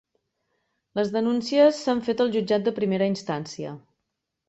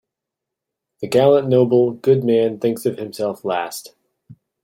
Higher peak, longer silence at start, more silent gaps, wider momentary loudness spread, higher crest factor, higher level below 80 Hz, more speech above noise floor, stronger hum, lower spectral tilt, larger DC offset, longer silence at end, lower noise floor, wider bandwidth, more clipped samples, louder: second, -8 dBFS vs -2 dBFS; about the same, 0.95 s vs 1 s; neither; first, 14 LU vs 11 LU; about the same, 18 dB vs 16 dB; about the same, -66 dBFS vs -62 dBFS; second, 58 dB vs 66 dB; neither; about the same, -6 dB/octave vs -6.5 dB/octave; neither; first, 0.7 s vs 0.3 s; about the same, -81 dBFS vs -83 dBFS; second, 8.2 kHz vs 16.5 kHz; neither; second, -24 LUFS vs -18 LUFS